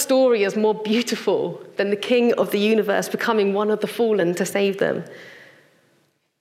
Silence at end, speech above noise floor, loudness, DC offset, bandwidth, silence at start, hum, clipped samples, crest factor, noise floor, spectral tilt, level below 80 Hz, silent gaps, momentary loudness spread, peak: 0.95 s; 44 dB; -21 LUFS; under 0.1%; 16 kHz; 0 s; none; under 0.1%; 14 dB; -64 dBFS; -4.5 dB/octave; -80 dBFS; none; 6 LU; -6 dBFS